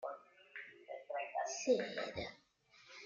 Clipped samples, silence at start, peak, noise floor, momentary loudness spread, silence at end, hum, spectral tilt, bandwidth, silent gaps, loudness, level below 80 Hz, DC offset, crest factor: under 0.1%; 0 s; -22 dBFS; -68 dBFS; 18 LU; 0 s; none; -3 dB/octave; 7.6 kHz; none; -41 LUFS; -74 dBFS; under 0.1%; 22 dB